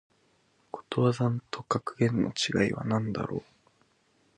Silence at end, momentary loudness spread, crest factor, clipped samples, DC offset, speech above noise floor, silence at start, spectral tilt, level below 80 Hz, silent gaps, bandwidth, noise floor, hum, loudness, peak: 0.95 s; 10 LU; 20 dB; under 0.1%; under 0.1%; 39 dB; 0.75 s; -6 dB/octave; -60 dBFS; none; 10 kHz; -68 dBFS; none; -29 LUFS; -10 dBFS